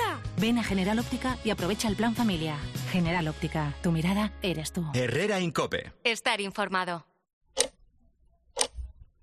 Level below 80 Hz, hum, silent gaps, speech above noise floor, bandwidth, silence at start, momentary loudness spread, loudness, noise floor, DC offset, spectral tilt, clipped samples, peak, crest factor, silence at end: -48 dBFS; none; 7.33-7.41 s; 35 dB; 14 kHz; 0 s; 5 LU; -29 LUFS; -64 dBFS; under 0.1%; -4.5 dB/octave; under 0.1%; -4 dBFS; 26 dB; 0.2 s